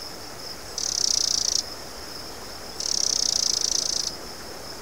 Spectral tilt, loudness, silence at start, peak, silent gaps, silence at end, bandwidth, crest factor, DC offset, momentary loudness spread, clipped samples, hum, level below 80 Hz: 0.5 dB/octave; -22 LUFS; 0 s; -6 dBFS; none; 0 s; 19 kHz; 22 dB; 0.7%; 16 LU; under 0.1%; none; -52 dBFS